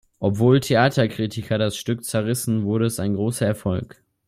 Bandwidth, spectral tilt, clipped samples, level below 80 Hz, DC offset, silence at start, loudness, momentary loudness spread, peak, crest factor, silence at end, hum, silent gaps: 16 kHz; -6 dB/octave; under 0.1%; -54 dBFS; under 0.1%; 0.2 s; -22 LUFS; 9 LU; -4 dBFS; 18 dB; 0.4 s; none; none